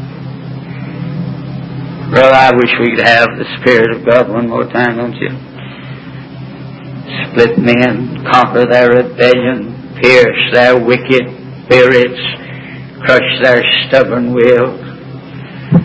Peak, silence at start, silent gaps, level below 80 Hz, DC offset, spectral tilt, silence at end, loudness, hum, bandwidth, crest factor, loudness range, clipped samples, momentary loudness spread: 0 dBFS; 0 s; none; -44 dBFS; under 0.1%; -6.5 dB/octave; 0 s; -9 LUFS; none; 8 kHz; 10 dB; 6 LU; 1%; 20 LU